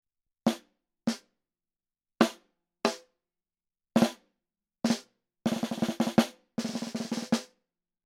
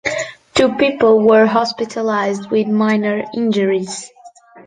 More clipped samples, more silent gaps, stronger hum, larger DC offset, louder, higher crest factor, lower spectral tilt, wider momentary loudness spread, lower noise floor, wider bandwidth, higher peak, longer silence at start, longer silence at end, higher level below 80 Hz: neither; neither; neither; neither; second, -31 LUFS vs -15 LUFS; first, 26 dB vs 14 dB; about the same, -4.5 dB/octave vs -5 dB/octave; about the same, 8 LU vs 10 LU; first, under -90 dBFS vs -42 dBFS; first, 16 kHz vs 9.6 kHz; second, -6 dBFS vs -2 dBFS; first, 0.45 s vs 0.05 s; first, 0.6 s vs 0.05 s; second, -72 dBFS vs -54 dBFS